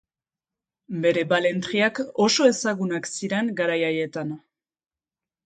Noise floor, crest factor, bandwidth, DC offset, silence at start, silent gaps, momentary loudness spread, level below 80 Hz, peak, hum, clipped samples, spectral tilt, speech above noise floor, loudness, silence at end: under -90 dBFS; 20 dB; 9.4 kHz; under 0.1%; 0.9 s; none; 11 LU; -70 dBFS; -6 dBFS; none; under 0.1%; -4 dB/octave; over 67 dB; -23 LUFS; 1.05 s